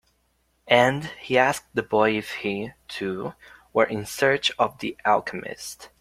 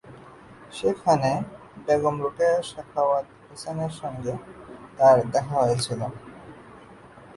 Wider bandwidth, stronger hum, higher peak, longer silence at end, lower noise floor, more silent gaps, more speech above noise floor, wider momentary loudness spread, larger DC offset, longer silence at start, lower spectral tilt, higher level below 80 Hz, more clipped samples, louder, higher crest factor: first, 16 kHz vs 11.5 kHz; neither; first, -2 dBFS vs -6 dBFS; first, 0.15 s vs 0 s; first, -68 dBFS vs -47 dBFS; neither; first, 44 dB vs 24 dB; second, 13 LU vs 23 LU; neither; first, 0.65 s vs 0.05 s; second, -4 dB/octave vs -5.5 dB/octave; about the same, -60 dBFS vs -58 dBFS; neither; about the same, -24 LUFS vs -24 LUFS; about the same, 22 dB vs 20 dB